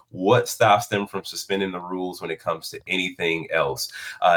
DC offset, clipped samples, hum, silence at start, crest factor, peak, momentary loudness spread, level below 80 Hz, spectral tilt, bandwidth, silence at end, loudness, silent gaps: under 0.1%; under 0.1%; none; 0.15 s; 18 dB; -6 dBFS; 11 LU; -62 dBFS; -4 dB/octave; 19.5 kHz; 0 s; -24 LUFS; none